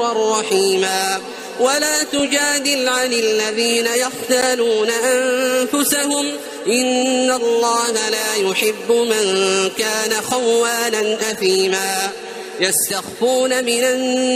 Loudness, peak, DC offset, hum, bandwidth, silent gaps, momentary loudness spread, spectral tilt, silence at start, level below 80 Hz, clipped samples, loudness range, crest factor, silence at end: -17 LUFS; -2 dBFS; under 0.1%; none; 15.5 kHz; none; 4 LU; -1.5 dB/octave; 0 s; -62 dBFS; under 0.1%; 1 LU; 14 dB; 0 s